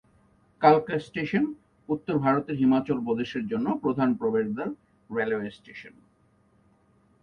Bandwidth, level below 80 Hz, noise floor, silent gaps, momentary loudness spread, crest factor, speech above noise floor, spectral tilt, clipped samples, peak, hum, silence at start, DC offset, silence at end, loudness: 6.8 kHz; -64 dBFS; -64 dBFS; none; 15 LU; 22 dB; 38 dB; -8.5 dB/octave; under 0.1%; -6 dBFS; none; 0.6 s; under 0.1%; 1.35 s; -26 LUFS